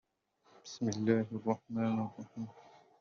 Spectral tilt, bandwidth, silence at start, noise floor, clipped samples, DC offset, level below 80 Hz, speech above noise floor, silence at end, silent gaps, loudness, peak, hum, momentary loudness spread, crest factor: -7 dB/octave; 7.2 kHz; 0.65 s; -71 dBFS; under 0.1%; under 0.1%; -78 dBFS; 36 dB; 0.35 s; none; -36 LUFS; -16 dBFS; none; 15 LU; 20 dB